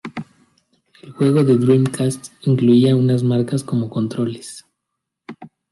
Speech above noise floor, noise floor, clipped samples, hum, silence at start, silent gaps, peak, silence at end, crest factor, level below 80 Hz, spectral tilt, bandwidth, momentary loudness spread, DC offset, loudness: 63 dB; -79 dBFS; under 0.1%; none; 0.05 s; none; -2 dBFS; 0.25 s; 16 dB; -60 dBFS; -7.5 dB/octave; 12 kHz; 20 LU; under 0.1%; -17 LUFS